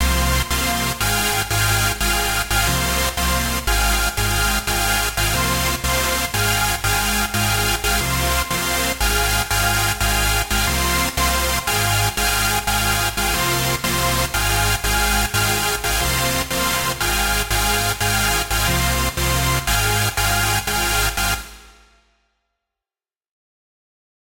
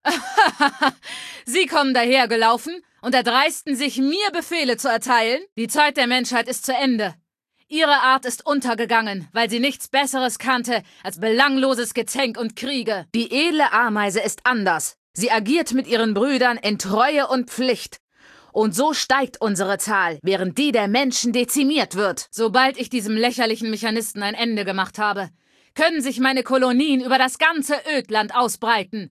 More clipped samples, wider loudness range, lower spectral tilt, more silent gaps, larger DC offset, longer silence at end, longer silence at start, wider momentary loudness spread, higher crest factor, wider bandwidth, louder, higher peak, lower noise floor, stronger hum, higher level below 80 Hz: neither; about the same, 1 LU vs 2 LU; about the same, -2.5 dB/octave vs -3 dB/octave; second, none vs 5.52-5.56 s, 14.98-15.14 s, 18.00-18.08 s; neither; first, 2.55 s vs 0.05 s; about the same, 0 s vs 0.05 s; second, 2 LU vs 7 LU; about the same, 14 dB vs 18 dB; about the same, 16.5 kHz vs 15 kHz; about the same, -18 LUFS vs -20 LUFS; second, -6 dBFS vs -2 dBFS; first, under -90 dBFS vs -69 dBFS; neither; first, -28 dBFS vs -68 dBFS